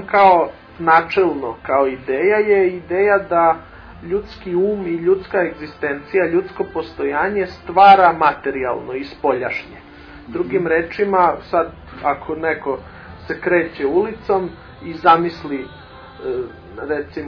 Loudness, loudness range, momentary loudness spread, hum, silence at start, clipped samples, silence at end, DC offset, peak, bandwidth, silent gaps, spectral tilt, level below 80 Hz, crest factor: -18 LUFS; 5 LU; 14 LU; none; 0 s; under 0.1%; 0 s; under 0.1%; 0 dBFS; 5.4 kHz; none; -7.5 dB/octave; -46 dBFS; 18 dB